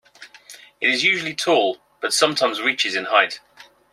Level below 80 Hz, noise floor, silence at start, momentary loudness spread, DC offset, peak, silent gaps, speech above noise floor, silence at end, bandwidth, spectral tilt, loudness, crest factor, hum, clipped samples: -70 dBFS; -45 dBFS; 0.2 s; 8 LU; under 0.1%; -2 dBFS; none; 25 dB; 0.3 s; 16 kHz; -1.5 dB/octave; -19 LUFS; 20 dB; none; under 0.1%